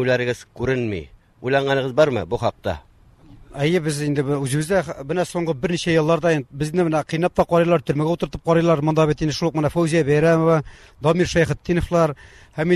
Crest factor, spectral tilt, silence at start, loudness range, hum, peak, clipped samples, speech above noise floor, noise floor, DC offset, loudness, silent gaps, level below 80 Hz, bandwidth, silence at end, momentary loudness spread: 16 dB; -6.5 dB/octave; 0 s; 4 LU; none; -4 dBFS; under 0.1%; 28 dB; -48 dBFS; under 0.1%; -20 LUFS; none; -42 dBFS; 13 kHz; 0 s; 8 LU